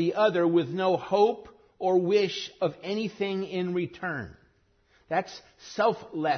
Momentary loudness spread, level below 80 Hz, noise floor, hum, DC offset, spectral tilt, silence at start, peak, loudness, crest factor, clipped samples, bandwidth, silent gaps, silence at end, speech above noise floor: 12 LU; -66 dBFS; -65 dBFS; none; under 0.1%; -6 dB/octave; 0 s; -10 dBFS; -27 LUFS; 18 dB; under 0.1%; 6.6 kHz; none; 0 s; 39 dB